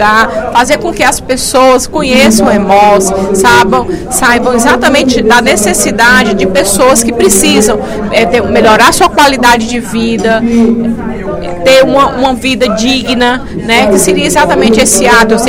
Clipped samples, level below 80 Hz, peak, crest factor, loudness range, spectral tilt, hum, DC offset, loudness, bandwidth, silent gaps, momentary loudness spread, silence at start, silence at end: 3%; -28 dBFS; 0 dBFS; 6 dB; 2 LU; -3 dB/octave; none; under 0.1%; -7 LUFS; over 20 kHz; none; 7 LU; 0 s; 0 s